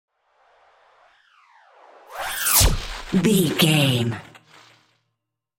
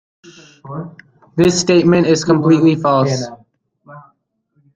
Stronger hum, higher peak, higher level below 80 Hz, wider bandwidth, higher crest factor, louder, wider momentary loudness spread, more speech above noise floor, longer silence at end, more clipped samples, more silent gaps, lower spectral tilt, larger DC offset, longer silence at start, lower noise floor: neither; about the same, -2 dBFS vs -2 dBFS; first, -34 dBFS vs -50 dBFS; first, 17 kHz vs 9.4 kHz; first, 22 dB vs 14 dB; second, -19 LUFS vs -13 LUFS; second, 15 LU vs 18 LU; first, 61 dB vs 49 dB; first, 1.35 s vs 0.75 s; neither; neither; second, -3.5 dB/octave vs -5.5 dB/octave; neither; first, 2.1 s vs 0.65 s; first, -80 dBFS vs -62 dBFS